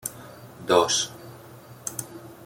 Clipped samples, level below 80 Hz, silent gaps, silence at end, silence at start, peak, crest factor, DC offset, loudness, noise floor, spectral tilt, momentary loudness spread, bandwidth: under 0.1%; -64 dBFS; none; 0 s; 0.05 s; -6 dBFS; 24 dB; under 0.1%; -25 LUFS; -46 dBFS; -2.5 dB/octave; 24 LU; 17 kHz